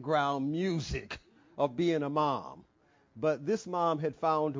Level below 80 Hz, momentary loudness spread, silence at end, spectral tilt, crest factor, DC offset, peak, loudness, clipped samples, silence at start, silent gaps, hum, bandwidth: -56 dBFS; 11 LU; 0 s; -6.5 dB/octave; 18 dB; under 0.1%; -14 dBFS; -32 LUFS; under 0.1%; 0 s; none; none; 7.6 kHz